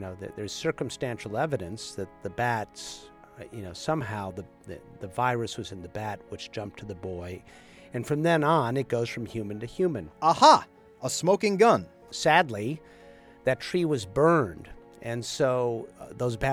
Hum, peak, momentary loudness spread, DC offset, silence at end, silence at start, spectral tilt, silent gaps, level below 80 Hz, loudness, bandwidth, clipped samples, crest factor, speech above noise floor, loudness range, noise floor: none; -4 dBFS; 18 LU; under 0.1%; 0 s; 0 s; -5 dB/octave; none; -56 dBFS; -27 LUFS; 18.5 kHz; under 0.1%; 24 dB; 24 dB; 11 LU; -51 dBFS